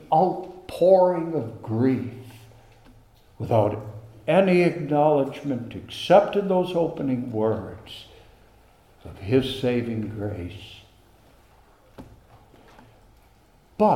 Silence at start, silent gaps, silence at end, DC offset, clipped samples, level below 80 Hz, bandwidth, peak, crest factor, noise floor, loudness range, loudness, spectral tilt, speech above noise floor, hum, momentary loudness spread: 0 s; none; 0 s; under 0.1%; under 0.1%; -56 dBFS; 15 kHz; -4 dBFS; 22 dB; -57 dBFS; 10 LU; -23 LUFS; -7.5 dB/octave; 34 dB; none; 20 LU